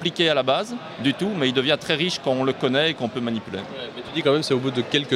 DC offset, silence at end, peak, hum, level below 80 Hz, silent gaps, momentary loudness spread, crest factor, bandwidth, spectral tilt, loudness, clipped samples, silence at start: under 0.1%; 0 s; -4 dBFS; none; -64 dBFS; none; 10 LU; 18 dB; 14 kHz; -5 dB/octave; -22 LUFS; under 0.1%; 0 s